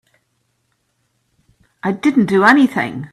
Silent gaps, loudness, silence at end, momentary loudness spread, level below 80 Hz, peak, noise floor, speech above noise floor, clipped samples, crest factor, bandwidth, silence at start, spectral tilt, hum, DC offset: none; -14 LUFS; 0.05 s; 12 LU; -60 dBFS; 0 dBFS; -67 dBFS; 53 dB; under 0.1%; 18 dB; 13 kHz; 1.85 s; -6.5 dB/octave; none; under 0.1%